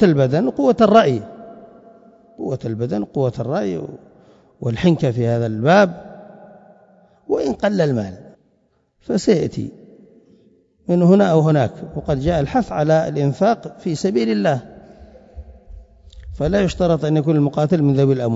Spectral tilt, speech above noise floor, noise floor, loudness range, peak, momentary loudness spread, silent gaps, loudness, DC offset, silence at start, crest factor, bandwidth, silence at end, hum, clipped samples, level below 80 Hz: -7.5 dB/octave; 46 dB; -63 dBFS; 6 LU; 0 dBFS; 15 LU; none; -18 LUFS; under 0.1%; 0 s; 18 dB; 7.8 kHz; 0 s; none; under 0.1%; -42 dBFS